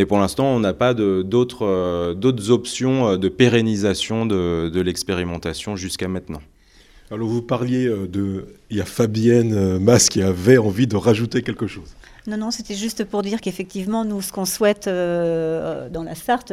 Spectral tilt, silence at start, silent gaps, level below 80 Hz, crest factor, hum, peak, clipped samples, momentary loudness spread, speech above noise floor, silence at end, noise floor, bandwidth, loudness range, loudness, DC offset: -5 dB/octave; 0 s; none; -46 dBFS; 20 dB; none; 0 dBFS; under 0.1%; 12 LU; 30 dB; 0 s; -50 dBFS; 15.5 kHz; 8 LU; -20 LUFS; under 0.1%